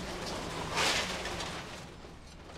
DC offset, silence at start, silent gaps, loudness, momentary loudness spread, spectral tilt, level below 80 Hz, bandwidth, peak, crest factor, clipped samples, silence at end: under 0.1%; 0 s; none; -34 LUFS; 21 LU; -2.5 dB/octave; -52 dBFS; 16 kHz; -16 dBFS; 20 dB; under 0.1%; 0 s